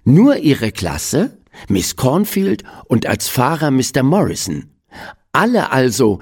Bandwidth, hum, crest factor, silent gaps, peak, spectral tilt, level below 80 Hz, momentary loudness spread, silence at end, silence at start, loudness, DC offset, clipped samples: 17.5 kHz; none; 14 dB; none; 0 dBFS; -5.5 dB/octave; -42 dBFS; 10 LU; 0 s; 0.05 s; -16 LUFS; under 0.1%; under 0.1%